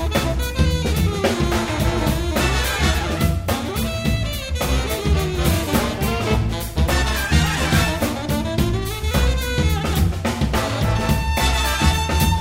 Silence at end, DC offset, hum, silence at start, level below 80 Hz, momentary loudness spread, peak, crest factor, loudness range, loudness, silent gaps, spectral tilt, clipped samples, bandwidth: 0 s; under 0.1%; none; 0 s; -24 dBFS; 4 LU; -2 dBFS; 16 dB; 1 LU; -20 LUFS; none; -5 dB/octave; under 0.1%; 16.5 kHz